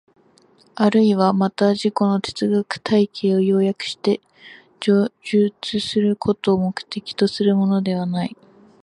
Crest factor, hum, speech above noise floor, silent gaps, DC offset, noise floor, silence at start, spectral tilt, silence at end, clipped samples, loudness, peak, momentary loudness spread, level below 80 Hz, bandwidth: 16 dB; none; 36 dB; none; under 0.1%; -55 dBFS; 0.75 s; -6.5 dB/octave; 0.55 s; under 0.1%; -20 LUFS; -2 dBFS; 8 LU; -60 dBFS; 11 kHz